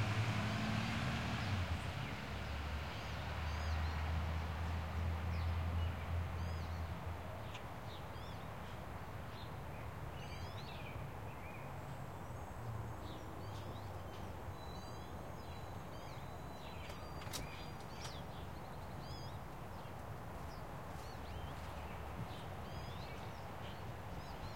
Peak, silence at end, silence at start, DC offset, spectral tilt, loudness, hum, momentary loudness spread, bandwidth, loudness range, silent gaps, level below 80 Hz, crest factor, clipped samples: -26 dBFS; 0 s; 0 s; 0.2%; -5.5 dB/octave; -45 LUFS; none; 9 LU; 16.5 kHz; 8 LU; none; -54 dBFS; 18 dB; under 0.1%